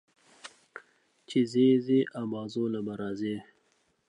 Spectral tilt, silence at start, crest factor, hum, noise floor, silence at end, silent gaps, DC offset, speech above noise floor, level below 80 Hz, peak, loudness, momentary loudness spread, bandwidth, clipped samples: -7 dB/octave; 0.45 s; 18 dB; none; -71 dBFS; 0.65 s; none; under 0.1%; 44 dB; -74 dBFS; -14 dBFS; -29 LUFS; 25 LU; 10 kHz; under 0.1%